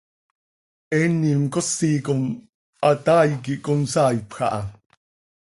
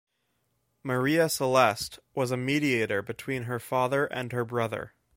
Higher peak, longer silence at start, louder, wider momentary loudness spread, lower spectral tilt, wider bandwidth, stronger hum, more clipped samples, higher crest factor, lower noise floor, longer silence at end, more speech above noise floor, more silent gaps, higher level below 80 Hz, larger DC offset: about the same, -6 dBFS vs -6 dBFS; about the same, 0.9 s vs 0.85 s; first, -21 LUFS vs -28 LUFS; about the same, 10 LU vs 10 LU; about the same, -6 dB/octave vs -5 dB/octave; second, 11.5 kHz vs 16.5 kHz; neither; neither; second, 16 dB vs 22 dB; first, under -90 dBFS vs -75 dBFS; first, 0.75 s vs 0.3 s; first, over 70 dB vs 48 dB; first, 2.54-2.73 s vs none; first, -56 dBFS vs -64 dBFS; neither